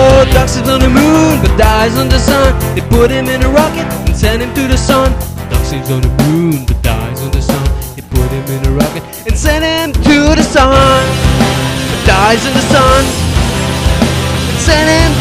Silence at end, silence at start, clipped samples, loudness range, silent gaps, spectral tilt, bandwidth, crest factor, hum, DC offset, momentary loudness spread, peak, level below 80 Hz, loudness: 0 s; 0 s; 0.6%; 5 LU; none; -5 dB/octave; 16 kHz; 10 dB; none; under 0.1%; 8 LU; 0 dBFS; -16 dBFS; -10 LUFS